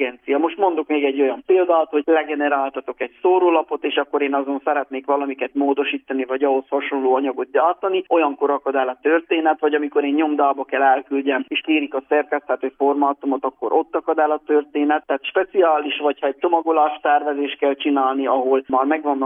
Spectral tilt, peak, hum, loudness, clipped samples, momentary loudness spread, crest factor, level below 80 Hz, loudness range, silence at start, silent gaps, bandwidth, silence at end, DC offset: -7 dB/octave; -4 dBFS; none; -20 LUFS; under 0.1%; 5 LU; 16 dB; -70 dBFS; 2 LU; 0 s; none; 3.7 kHz; 0 s; under 0.1%